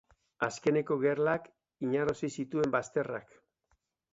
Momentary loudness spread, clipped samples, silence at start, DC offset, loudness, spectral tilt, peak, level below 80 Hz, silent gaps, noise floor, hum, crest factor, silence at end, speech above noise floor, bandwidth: 7 LU; under 0.1%; 0.4 s; under 0.1%; -32 LUFS; -6 dB/octave; -14 dBFS; -68 dBFS; none; -77 dBFS; none; 20 dB; 0.95 s; 45 dB; 8 kHz